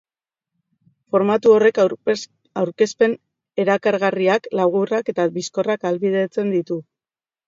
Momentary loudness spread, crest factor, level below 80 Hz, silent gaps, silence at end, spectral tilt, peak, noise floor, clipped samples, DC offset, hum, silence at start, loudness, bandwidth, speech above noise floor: 11 LU; 18 dB; -70 dBFS; none; 0.65 s; -5.5 dB/octave; -2 dBFS; under -90 dBFS; under 0.1%; under 0.1%; none; 1.15 s; -19 LUFS; 7.8 kHz; over 72 dB